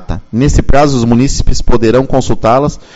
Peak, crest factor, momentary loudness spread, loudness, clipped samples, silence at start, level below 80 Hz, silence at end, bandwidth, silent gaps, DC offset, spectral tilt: 0 dBFS; 8 dB; 4 LU; -11 LUFS; 0.9%; 0 s; -16 dBFS; 0.2 s; 8 kHz; none; under 0.1%; -6 dB/octave